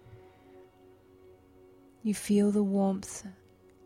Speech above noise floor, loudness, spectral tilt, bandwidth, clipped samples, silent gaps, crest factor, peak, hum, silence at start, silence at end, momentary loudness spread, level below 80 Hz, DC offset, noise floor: 30 dB; -29 LUFS; -6.5 dB/octave; 15 kHz; under 0.1%; none; 16 dB; -16 dBFS; none; 0.05 s; 0.55 s; 16 LU; -66 dBFS; under 0.1%; -58 dBFS